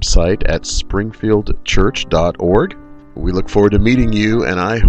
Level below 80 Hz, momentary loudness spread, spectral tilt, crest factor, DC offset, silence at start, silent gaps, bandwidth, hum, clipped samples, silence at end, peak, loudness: -20 dBFS; 7 LU; -5.5 dB/octave; 12 dB; under 0.1%; 0 s; none; 8.8 kHz; none; under 0.1%; 0 s; 0 dBFS; -15 LUFS